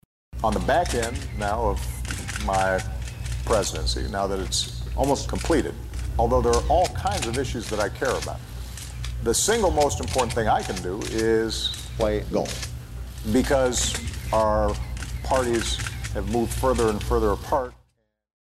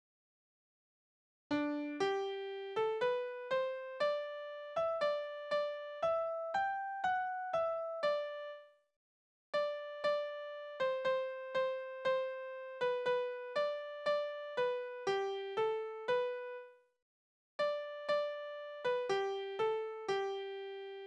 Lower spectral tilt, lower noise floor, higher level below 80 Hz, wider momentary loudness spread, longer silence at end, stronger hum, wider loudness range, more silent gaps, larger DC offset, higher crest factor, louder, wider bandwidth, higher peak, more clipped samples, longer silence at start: about the same, -4.5 dB/octave vs -4 dB/octave; second, -69 dBFS vs under -90 dBFS; first, -32 dBFS vs -80 dBFS; first, 11 LU vs 8 LU; first, 0.75 s vs 0 s; neither; about the same, 2 LU vs 2 LU; second, none vs 8.96-9.53 s, 17.02-17.59 s; neither; about the same, 16 dB vs 16 dB; first, -25 LUFS vs -38 LUFS; first, 14.5 kHz vs 9.6 kHz; first, -8 dBFS vs -22 dBFS; neither; second, 0.3 s vs 1.5 s